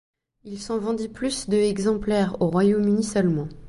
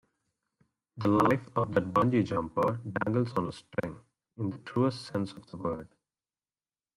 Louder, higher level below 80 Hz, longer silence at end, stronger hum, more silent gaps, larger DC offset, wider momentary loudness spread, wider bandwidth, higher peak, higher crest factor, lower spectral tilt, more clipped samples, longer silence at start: first, -23 LUFS vs -30 LUFS; first, -48 dBFS vs -62 dBFS; second, 0 s vs 1.15 s; neither; neither; neither; second, 8 LU vs 11 LU; second, 11.5 kHz vs 15 kHz; about the same, -8 dBFS vs -10 dBFS; second, 14 dB vs 20 dB; second, -6 dB/octave vs -8 dB/octave; neither; second, 0.45 s vs 0.95 s